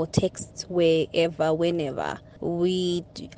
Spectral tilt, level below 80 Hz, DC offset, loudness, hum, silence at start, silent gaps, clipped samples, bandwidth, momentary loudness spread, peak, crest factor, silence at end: -5.5 dB/octave; -54 dBFS; under 0.1%; -25 LUFS; none; 0 s; none; under 0.1%; 9.4 kHz; 10 LU; -8 dBFS; 18 dB; 0 s